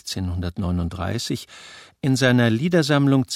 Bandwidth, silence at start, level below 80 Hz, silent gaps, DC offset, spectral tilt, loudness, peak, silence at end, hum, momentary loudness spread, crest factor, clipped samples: 15.5 kHz; 0.05 s; -44 dBFS; none; under 0.1%; -5.5 dB/octave; -21 LUFS; -4 dBFS; 0 s; none; 11 LU; 16 dB; under 0.1%